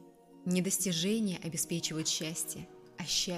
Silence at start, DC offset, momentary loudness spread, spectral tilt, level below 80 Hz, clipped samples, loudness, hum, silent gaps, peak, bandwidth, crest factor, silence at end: 0 s; under 0.1%; 13 LU; -3.5 dB/octave; -66 dBFS; under 0.1%; -33 LUFS; none; none; -16 dBFS; 15.5 kHz; 20 dB; 0 s